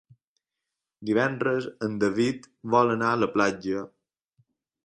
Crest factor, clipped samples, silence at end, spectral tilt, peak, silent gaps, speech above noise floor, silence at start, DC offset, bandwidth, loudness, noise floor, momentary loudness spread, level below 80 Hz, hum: 20 dB; under 0.1%; 1 s; -6 dB/octave; -8 dBFS; none; 61 dB; 1 s; under 0.1%; 11 kHz; -26 LUFS; -86 dBFS; 10 LU; -64 dBFS; none